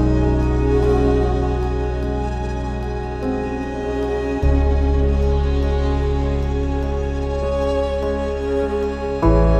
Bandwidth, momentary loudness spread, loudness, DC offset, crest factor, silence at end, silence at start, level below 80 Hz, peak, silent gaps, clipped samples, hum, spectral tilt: 8 kHz; 7 LU; -20 LUFS; under 0.1%; 14 dB; 0 s; 0 s; -22 dBFS; -4 dBFS; none; under 0.1%; none; -8.5 dB/octave